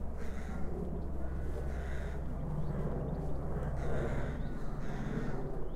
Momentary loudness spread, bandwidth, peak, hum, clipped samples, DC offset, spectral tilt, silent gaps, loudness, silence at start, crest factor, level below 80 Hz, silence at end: 4 LU; 11 kHz; -22 dBFS; none; under 0.1%; under 0.1%; -8.5 dB/octave; none; -40 LUFS; 0 s; 12 dB; -40 dBFS; 0 s